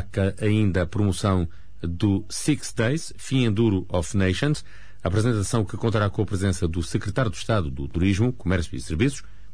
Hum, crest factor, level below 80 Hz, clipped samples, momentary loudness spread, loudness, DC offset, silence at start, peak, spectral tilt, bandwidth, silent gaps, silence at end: none; 14 dB; -40 dBFS; under 0.1%; 5 LU; -24 LUFS; 2%; 0 s; -10 dBFS; -6 dB/octave; 11 kHz; none; 0.1 s